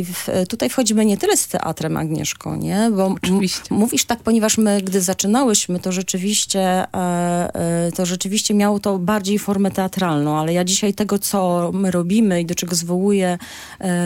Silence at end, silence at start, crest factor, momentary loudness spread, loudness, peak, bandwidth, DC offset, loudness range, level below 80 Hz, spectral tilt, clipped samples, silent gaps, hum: 0 s; 0 s; 18 dB; 6 LU; -18 LUFS; -2 dBFS; 17 kHz; under 0.1%; 2 LU; -52 dBFS; -4.5 dB/octave; under 0.1%; none; none